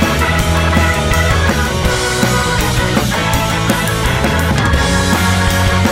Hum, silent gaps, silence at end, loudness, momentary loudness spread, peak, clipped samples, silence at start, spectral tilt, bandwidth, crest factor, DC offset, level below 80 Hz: none; none; 0 s; -13 LUFS; 2 LU; 0 dBFS; under 0.1%; 0 s; -4.5 dB/octave; 16.5 kHz; 12 dB; under 0.1%; -22 dBFS